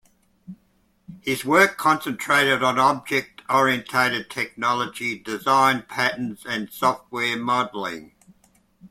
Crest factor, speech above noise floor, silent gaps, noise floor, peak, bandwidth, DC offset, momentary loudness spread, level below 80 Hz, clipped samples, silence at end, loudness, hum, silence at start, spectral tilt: 22 dB; 42 dB; none; -64 dBFS; -2 dBFS; 16.5 kHz; under 0.1%; 11 LU; -62 dBFS; under 0.1%; 0.05 s; -22 LUFS; none; 0.5 s; -3.5 dB/octave